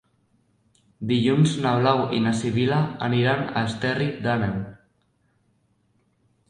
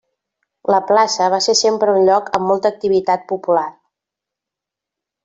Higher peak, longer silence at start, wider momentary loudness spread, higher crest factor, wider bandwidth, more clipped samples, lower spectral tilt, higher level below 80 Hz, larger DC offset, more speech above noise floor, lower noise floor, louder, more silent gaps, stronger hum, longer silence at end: second, -4 dBFS vs 0 dBFS; first, 1 s vs 0.7 s; about the same, 6 LU vs 6 LU; first, 22 dB vs 16 dB; first, 11 kHz vs 8 kHz; neither; first, -6.5 dB/octave vs -3 dB/octave; first, -56 dBFS vs -62 dBFS; neither; second, 45 dB vs 70 dB; second, -67 dBFS vs -85 dBFS; second, -23 LUFS vs -15 LUFS; neither; neither; first, 1.75 s vs 1.55 s